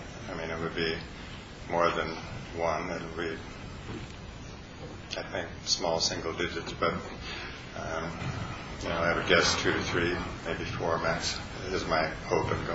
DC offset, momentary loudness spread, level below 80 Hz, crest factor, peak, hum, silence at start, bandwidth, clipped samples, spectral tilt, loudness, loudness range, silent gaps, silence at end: under 0.1%; 15 LU; -48 dBFS; 24 dB; -8 dBFS; none; 0 s; 8.2 kHz; under 0.1%; -3.5 dB/octave; -31 LUFS; 7 LU; none; 0 s